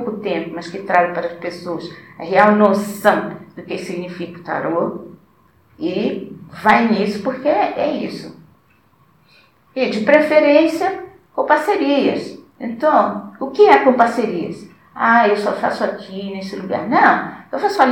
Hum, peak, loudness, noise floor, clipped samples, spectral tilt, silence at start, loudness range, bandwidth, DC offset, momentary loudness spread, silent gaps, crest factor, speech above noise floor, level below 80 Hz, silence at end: none; 0 dBFS; -17 LUFS; -55 dBFS; under 0.1%; -6 dB/octave; 0 s; 6 LU; 17.5 kHz; under 0.1%; 17 LU; none; 18 dB; 39 dB; -62 dBFS; 0 s